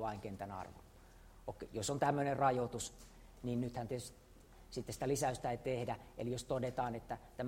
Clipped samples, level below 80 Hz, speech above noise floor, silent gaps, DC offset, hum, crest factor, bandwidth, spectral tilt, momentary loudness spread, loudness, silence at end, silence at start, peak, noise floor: under 0.1%; -60 dBFS; 20 dB; none; under 0.1%; none; 20 dB; 16 kHz; -5 dB/octave; 16 LU; -40 LUFS; 0 s; 0 s; -20 dBFS; -60 dBFS